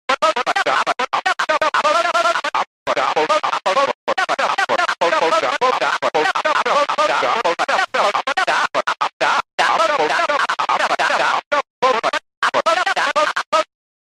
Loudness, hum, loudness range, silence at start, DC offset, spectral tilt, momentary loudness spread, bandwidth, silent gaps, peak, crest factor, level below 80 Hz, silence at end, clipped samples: -17 LUFS; none; 1 LU; 0.1 s; under 0.1%; -1.5 dB/octave; 4 LU; 14 kHz; 2.67-2.86 s, 3.95-4.07 s, 9.13-9.20 s, 9.53-9.58 s, 11.46-11.51 s, 11.70-11.82 s, 12.37-12.42 s, 13.46-13.52 s; -2 dBFS; 16 dB; -66 dBFS; 0.4 s; under 0.1%